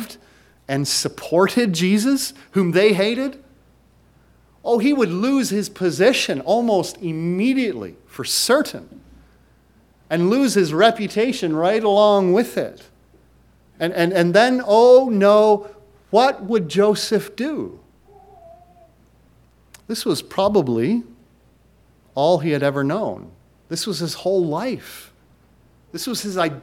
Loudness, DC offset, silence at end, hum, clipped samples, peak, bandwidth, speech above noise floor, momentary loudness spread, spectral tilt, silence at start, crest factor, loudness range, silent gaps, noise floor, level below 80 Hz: -18 LUFS; under 0.1%; 0 s; none; under 0.1%; 0 dBFS; 17 kHz; 37 dB; 13 LU; -5 dB/octave; 0 s; 20 dB; 8 LU; none; -55 dBFS; -58 dBFS